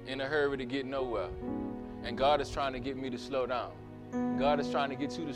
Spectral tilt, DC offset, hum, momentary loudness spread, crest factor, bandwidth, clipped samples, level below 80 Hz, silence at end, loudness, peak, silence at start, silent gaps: -5.5 dB/octave; under 0.1%; none; 11 LU; 18 dB; 11.5 kHz; under 0.1%; -52 dBFS; 0 s; -33 LUFS; -16 dBFS; 0 s; none